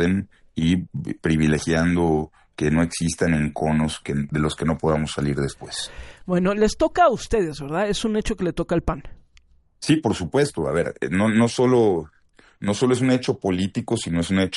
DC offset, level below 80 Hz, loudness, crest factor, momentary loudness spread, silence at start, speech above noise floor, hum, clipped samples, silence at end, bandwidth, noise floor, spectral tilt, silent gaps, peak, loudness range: under 0.1%; -40 dBFS; -22 LUFS; 16 dB; 9 LU; 0 s; 34 dB; none; under 0.1%; 0 s; 11.5 kHz; -55 dBFS; -6 dB/octave; none; -6 dBFS; 3 LU